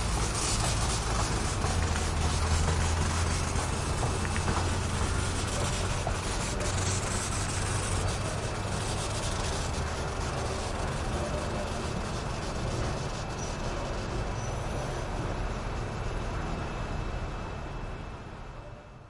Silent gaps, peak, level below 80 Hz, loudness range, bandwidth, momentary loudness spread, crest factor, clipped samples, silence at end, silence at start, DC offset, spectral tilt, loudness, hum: none; -14 dBFS; -36 dBFS; 6 LU; 11.5 kHz; 7 LU; 16 dB; under 0.1%; 0 s; 0 s; under 0.1%; -4 dB/octave; -31 LUFS; none